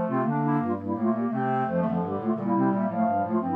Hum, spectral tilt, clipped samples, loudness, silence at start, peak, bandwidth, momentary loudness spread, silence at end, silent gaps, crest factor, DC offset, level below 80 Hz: none; -11 dB/octave; under 0.1%; -26 LUFS; 0 s; -12 dBFS; 3.7 kHz; 3 LU; 0 s; none; 12 dB; under 0.1%; -68 dBFS